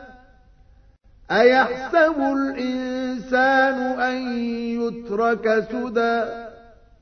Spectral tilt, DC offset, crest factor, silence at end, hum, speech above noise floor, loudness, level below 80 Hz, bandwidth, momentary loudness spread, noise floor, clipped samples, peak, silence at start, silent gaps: -5.5 dB/octave; under 0.1%; 18 dB; 0.45 s; none; 32 dB; -21 LUFS; -52 dBFS; 6.6 kHz; 10 LU; -52 dBFS; under 0.1%; -4 dBFS; 0 s; none